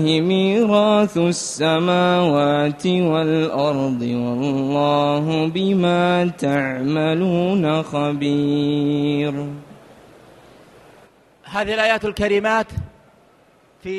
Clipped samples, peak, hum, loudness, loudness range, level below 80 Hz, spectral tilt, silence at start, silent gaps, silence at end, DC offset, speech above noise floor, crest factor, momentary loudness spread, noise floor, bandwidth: under 0.1%; -4 dBFS; none; -19 LUFS; 6 LU; -50 dBFS; -6 dB/octave; 0 s; none; 0 s; under 0.1%; 36 dB; 16 dB; 6 LU; -54 dBFS; 12.5 kHz